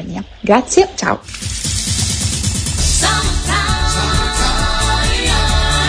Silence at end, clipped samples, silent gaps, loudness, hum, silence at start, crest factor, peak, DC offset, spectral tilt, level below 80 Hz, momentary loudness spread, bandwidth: 0 s; under 0.1%; none; -15 LUFS; none; 0 s; 16 dB; 0 dBFS; under 0.1%; -3 dB/octave; -20 dBFS; 6 LU; 11 kHz